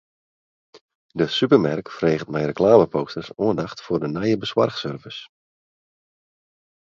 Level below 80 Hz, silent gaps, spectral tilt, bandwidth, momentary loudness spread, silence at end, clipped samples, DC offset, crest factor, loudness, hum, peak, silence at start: -56 dBFS; 0.81-0.89 s, 0.95-1.09 s; -7 dB/octave; 7.6 kHz; 15 LU; 1.6 s; under 0.1%; under 0.1%; 22 dB; -21 LUFS; none; 0 dBFS; 0.75 s